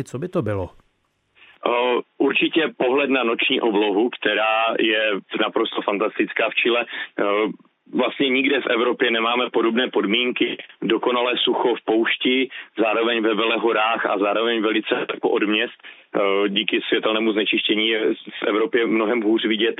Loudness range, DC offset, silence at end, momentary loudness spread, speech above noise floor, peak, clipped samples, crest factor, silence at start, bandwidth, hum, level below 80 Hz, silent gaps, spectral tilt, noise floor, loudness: 2 LU; under 0.1%; 0.05 s; 5 LU; 47 dB; -2 dBFS; under 0.1%; 18 dB; 0 s; 8.2 kHz; none; -68 dBFS; none; -6 dB/octave; -67 dBFS; -20 LUFS